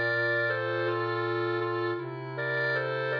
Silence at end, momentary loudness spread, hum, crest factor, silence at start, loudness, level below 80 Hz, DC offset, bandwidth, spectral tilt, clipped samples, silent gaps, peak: 0 s; 7 LU; none; 12 dB; 0 s; -29 LUFS; -82 dBFS; under 0.1%; 5.4 kHz; -7.5 dB/octave; under 0.1%; none; -18 dBFS